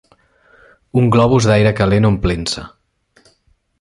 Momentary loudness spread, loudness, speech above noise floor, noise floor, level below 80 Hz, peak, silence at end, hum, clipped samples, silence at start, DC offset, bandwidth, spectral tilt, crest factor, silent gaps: 9 LU; -14 LUFS; 46 dB; -59 dBFS; -34 dBFS; -2 dBFS; 1.15 s; none; under 0.1%; 0.95 s; under 0.1%; 11.5 kHz; -6.5 dB/octave; 14 dB; none